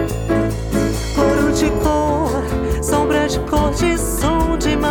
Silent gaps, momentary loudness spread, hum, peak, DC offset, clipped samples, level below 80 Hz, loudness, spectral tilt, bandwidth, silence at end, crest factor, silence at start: none; 4 LU; none; -2 dBFS; under 0.1%; under 0.1%; -24 dBFS; -17 LUFS; -5.5 dB/octave; 19.5 kHz; 0 s; 14 dB; 0 s